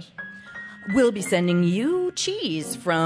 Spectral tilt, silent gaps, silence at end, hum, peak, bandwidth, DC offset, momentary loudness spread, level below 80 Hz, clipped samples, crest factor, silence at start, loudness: -5 dB/octave; none; 0 s; none; -8 dBFS; 11 kHz; under 0.1%; 17 LU; -60 dBFS; under 0.1%; 16 dB; 0 s; -23 LUFS